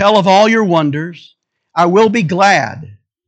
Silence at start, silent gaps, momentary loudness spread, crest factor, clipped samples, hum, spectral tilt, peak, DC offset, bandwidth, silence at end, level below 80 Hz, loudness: 0 s; none; 14 LU; 12 dB; under 0.1%; none; -5.5 dB/octave; 0 dBFS; under 0.1%; 8.8 kHz; 0.35 s; -60 dBFS; -11 LUFS